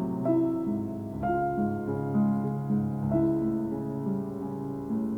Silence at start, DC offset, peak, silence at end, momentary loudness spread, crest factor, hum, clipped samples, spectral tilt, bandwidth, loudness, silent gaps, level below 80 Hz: 0 s; under 0.1%; -14 dBFS; 0 s; 7 LU; 14 dB; none; under 0.1%; -10.5 dB/octave; 3.6 kHz; -29 LUFS; none; -52 dBFS